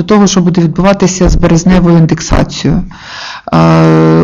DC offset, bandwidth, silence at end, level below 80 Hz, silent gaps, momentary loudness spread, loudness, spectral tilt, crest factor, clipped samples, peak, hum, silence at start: under 0.1%; 7.6 kHz; 0 s; -20 dBFS; none; 11 LU; -8 LUFS; -6 dB/octave; 8 dB; 0.2%; 0 dBFS; none; 0 s